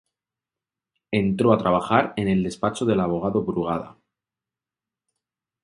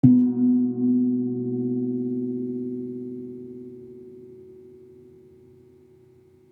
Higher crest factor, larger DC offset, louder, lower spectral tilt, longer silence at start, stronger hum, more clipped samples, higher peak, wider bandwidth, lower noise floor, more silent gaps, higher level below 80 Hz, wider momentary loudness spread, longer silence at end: about the same, 24 dB vs 22 dB; neither; about the same, -23 LUFS vs -24 LUFS; second, -7 dB/octave vs -13.5 dB/octave; first, 1.1 s vs 0.05 s; neither; neither; about the same, -2 dBFS vs -4 dBFS; first, 11.5 kHz vs 1.1 kHz; first, -90 dBFS vs -54 dBFS; neither; first, -52 dBFS vs -70 dBFS; second, 8 LU vs 24 LU; about the same, 1.7 s vs 1.75 s